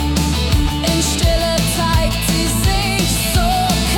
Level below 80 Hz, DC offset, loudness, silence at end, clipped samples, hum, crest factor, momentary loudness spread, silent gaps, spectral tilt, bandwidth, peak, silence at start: -22 dBFS; under 0.1%; -16 LUFS; 0 s; under 0.1%; none; 12 dB; 1 LU; none; -4 dB/octave; 18 kHz; -4 dBFS; 0 s